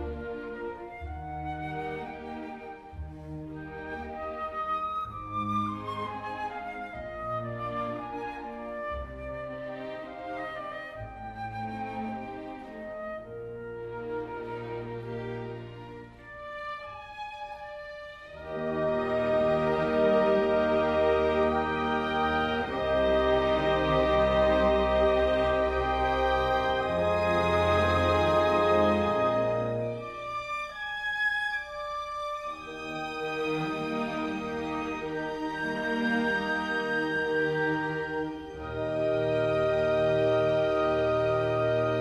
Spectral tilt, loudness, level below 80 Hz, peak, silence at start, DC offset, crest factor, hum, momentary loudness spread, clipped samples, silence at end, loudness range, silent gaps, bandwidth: -6.5 dB/octave; -29 LUFS; -46 dBFS; -12 dBFS; 0 s; under 0.1%; 16 dB; none; 16 LU; under 0.1%; 0 s; 13 LU; none; 11.5 kHz